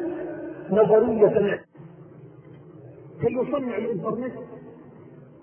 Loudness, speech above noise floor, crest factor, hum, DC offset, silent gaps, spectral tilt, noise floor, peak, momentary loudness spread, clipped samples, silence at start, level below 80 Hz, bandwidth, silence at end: -23 LUFS; 25 dB; 20 dB; none; under 0.1%; none; -11.5 dB/octave; -47 dBFS; -4 dBFS; 27 LU; under 0.1%; 0 s; -62 dBFS; 3.2 kHz; 0.2 s